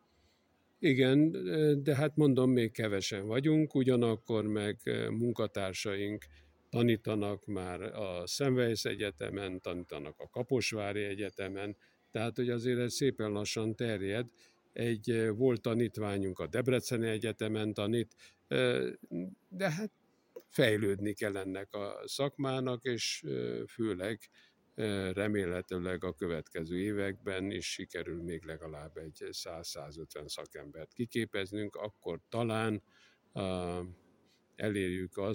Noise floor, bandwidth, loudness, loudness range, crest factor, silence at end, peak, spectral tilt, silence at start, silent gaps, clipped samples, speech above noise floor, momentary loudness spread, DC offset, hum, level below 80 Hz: -72 dBFS; 17 kHz; -34 LUFS; 9 LU; 22 dB; 0 s; -12 dBFS; -5.5 dB/octave; 0.8 s; none; under 0.1%; 38 dB; 13 LU; under 0.1%; none; -66 dBFS